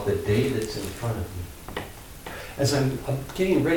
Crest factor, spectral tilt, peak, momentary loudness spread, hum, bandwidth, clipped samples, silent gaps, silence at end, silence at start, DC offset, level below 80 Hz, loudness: 16 dB; -5.5 dB/octave; -10 dBFS; 14 LU; none; 18 kHz; under 0.1%; none; 0 s; 0 s; under 0.1%; -44 dBFS; -27 LUFS